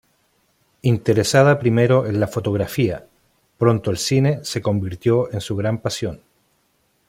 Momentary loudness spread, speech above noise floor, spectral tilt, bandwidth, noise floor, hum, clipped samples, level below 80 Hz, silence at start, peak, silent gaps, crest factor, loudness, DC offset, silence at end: 9 LU; 46 dB; -6 dB/octave; 16 kHz; -65 dBFS; none; under 0.1%; -52 dBFS; 0.85 s; -2 dBFS; none; 18 dB; -19 LUFS; under 0.1%; 0.9 s